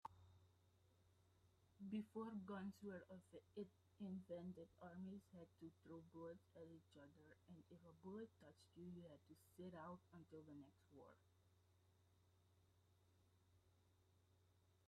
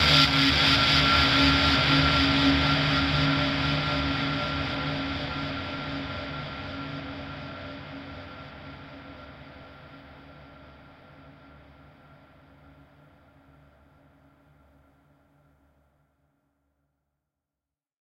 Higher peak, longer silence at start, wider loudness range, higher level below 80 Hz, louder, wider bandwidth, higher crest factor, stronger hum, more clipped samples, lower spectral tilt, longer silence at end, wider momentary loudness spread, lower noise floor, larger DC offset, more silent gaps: second, -40 dBFS vs -6 dBFS; about the same, 0.05 s vs 0 s; second, 8 LU vs 25 LU; second, -90 dBFS vs -42 dBFS; second, -59 LUFS vs -23 LUFS; second, 11.5 kHz vs 14.5 kHz; about the same, 20 dB vs 22 dB; neither; neither; first, -7.5 dB/octave vs -4.5 dB/octave; second, 0 s vs 6.7 s; second, 15 LU vs 24 LU; second, -79 dBFS vs -90 dBFS; neither; neither